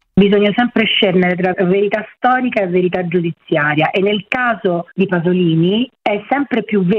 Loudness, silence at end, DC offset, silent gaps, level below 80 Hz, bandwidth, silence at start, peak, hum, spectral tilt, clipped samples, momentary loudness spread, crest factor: -15 LUFS; 0 s; under 0.1%; none; -50 dBFS; 5 kHz; 0.15 s; 0 dBFS; none; -8.5 dB/octave; under 0.1%; 6 LU; 14 dB